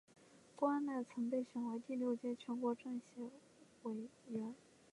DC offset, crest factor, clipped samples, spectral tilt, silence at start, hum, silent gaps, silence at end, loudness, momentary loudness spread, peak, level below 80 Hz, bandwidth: under 0.1%; 18 dB; under 0.1%; -6.5 dB/octave; 0.2 s; none; none; 0.35 s; -43 LUFS; 13 LU; -24 dBFS; -90 dBFS; 11 kHz